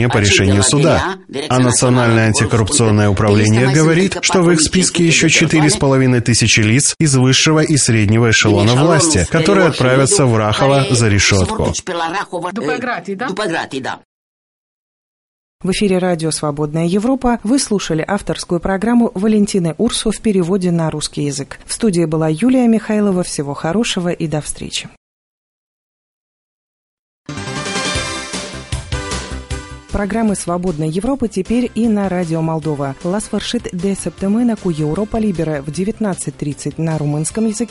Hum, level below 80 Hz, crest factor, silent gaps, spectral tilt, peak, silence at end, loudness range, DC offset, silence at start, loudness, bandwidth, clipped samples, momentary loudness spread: none; -36 dBFS; 14 dB; 14.05-15.59 s, 24.97-27.25 s; -4.5 dB/octave; 0 dBFS; 0.05 s; 11 LU; under 0.1%; 0 s; -14 LUFS; 11.5 kHz; under 0.1%; 11 LU